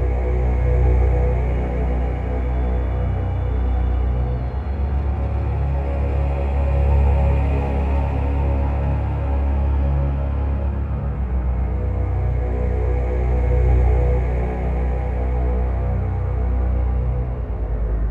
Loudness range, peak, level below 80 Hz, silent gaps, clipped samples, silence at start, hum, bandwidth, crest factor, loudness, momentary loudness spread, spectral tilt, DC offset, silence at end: 2 LU; -6 dBFS; -20 dBFS; none; under 0.1%; 0 s; none; 3.4 kHz; 12 dB; -22 LUFS; 6 LU; -10 dB/octave; under 0.1%; 0 s